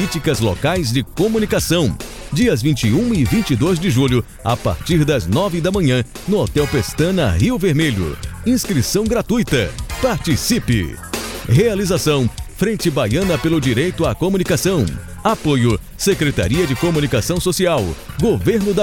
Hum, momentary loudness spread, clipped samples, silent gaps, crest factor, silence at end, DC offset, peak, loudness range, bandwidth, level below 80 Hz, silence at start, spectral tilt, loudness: none; 5 LU; under 0.1%; none; 14 dB; 0 s; under 0.1%; -2 dBFS; 1 LU; 17.5 kHz; -32 dBFS; 0 s; -5.5 dB/octave; -17 LUFS